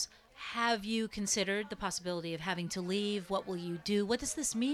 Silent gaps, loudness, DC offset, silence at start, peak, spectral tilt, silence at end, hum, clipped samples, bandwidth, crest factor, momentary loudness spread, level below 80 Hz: none; -35 LUFS; under 0.1%; 0 s; -18 dBFS; -3.5 dB/octave; 0 s; none; under 0.1%; 15 kHz; 18 dB; 6 LU; -62 dBFS